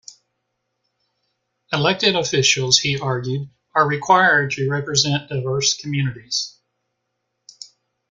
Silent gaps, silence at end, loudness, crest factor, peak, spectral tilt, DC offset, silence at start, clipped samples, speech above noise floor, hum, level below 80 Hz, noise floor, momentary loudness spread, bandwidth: none; 1.6 s; -18 LUFS; 20 dB; -2 dBFS; -3 dB/octave; under 0.1%; 0.1 s; under 0.1%; 56 dB; none; -58 dBFS; -75 dBFS; 11 LU; 9.4 kHz